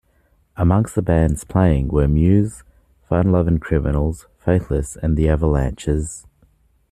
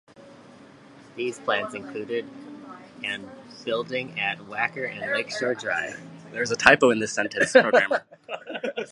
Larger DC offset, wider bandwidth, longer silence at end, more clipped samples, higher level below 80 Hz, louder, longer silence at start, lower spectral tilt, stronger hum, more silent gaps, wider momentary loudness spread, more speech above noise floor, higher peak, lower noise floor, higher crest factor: neither; first, 13.5 kHz vs 11.5 kHz; first, 0.7 s vs 0.05 s; neither; first, -28 dBFS vs -64 dBFS; first, -19 LUFS vs -24 LUFS; first, 0.55 s vs 0.2 s; first, -8 dB/octave vs -3.5 dB/octave; neither; neither; second, 8 LU vs 21 LU; first, 42 dB vs 24 dB; about the same, -2 dBFS vs 0 dBFS; first, -59 dBFS vs -49 dBFS; second, 16 dB vs 26 dB